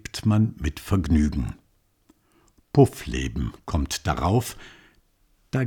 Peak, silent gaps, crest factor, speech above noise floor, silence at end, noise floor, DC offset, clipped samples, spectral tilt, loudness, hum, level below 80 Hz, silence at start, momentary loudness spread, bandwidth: -6 dBFS; none; 20 dB; 41 dB; 0 s; -64 dBFS; under 0.1%; under 0.1%; -6.5 dB/octave; -24 LUFS; none; -34 dBFS; 0.15 s; 12 LU; 19 kHz